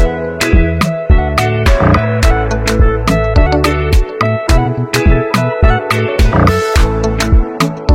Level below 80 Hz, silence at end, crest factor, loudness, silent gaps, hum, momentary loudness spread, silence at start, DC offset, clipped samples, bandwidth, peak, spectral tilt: -14 dBFS; 0 s; 10 dB; -12 LUFS; none; none; 4 LU; 0 s; under 0.1%; under 0.1%; 16 kHz; 0 dBFS; -6 dB/octave